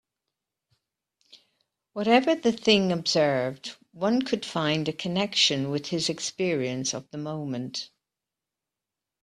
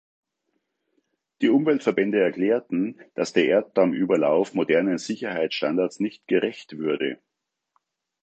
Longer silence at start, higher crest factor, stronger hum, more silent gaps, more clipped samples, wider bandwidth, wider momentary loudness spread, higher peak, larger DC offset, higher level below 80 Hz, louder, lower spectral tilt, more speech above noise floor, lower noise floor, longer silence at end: first, 1.95 s vs 1.4 s; about the same, 22 dB vs 18 dB; neither; neither; neither; first, 12.5 kHz vs 8.6 kHz; first, 13 LU vs 9 LU; about the same, -6 dBFS vs -6 dBFS; neither; about the same, -68 dBFS vs -72 dBFS; second, -26 LUFS vs -23 LUFS; second, -4 dB/octave vs -5.5 dB/octave; first, 62 dB vs 54 dB; first, -88 dBFS vs -76 dBFS; first, 1.35 s vs 1.1 s